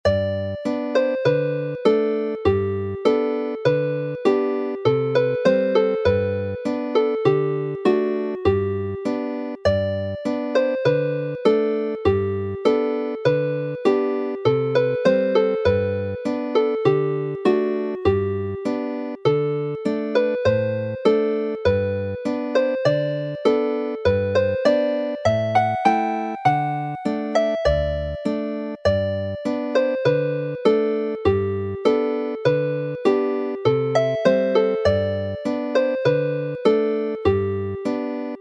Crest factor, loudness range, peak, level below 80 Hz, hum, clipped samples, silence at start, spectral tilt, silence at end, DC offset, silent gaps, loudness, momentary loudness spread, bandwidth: 18 dB; 2 LU; -2 dBFS; -44 dBFS; none; under 0.1%; 0.05 s; -7.5 dB/octave; 0 s; under 0.1%; none; -21 LUFS; 6 LU; 8.8 kHz